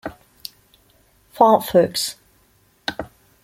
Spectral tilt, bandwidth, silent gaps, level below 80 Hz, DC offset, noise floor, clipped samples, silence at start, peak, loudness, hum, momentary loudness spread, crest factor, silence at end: -4 dB/octave; 16.5 kHz; none; -56 dBFS; under 0.1%; -59 dBFS; under 0.1%; 0.05 s; 0 dBFS; -19 LUFS; none; 22 LU; 22 dB; 0.4 s